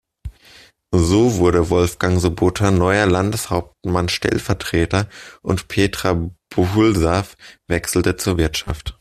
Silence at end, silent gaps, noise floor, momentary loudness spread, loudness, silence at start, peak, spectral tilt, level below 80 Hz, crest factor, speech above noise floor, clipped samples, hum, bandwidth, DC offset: 0.05 s; none; -48 dBFS; 9 LU; -18 LUFS; 0.25 s; -2 dBFS; -5.5 dB/octave; -36 dBFS; 16 dB; 30 dB; under 0.1%; none; 14.5 kHz; under 0.1%